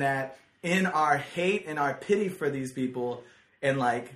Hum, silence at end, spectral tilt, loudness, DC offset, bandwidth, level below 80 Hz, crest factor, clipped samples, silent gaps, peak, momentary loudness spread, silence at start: none; 0 s; -5.5 dB/octave; -28 LUFS; under 0.1%; 14 kHz; -68 dBFS; 18 dB; under 0.1%; none; -10 dBFS; 9 LU; 0 s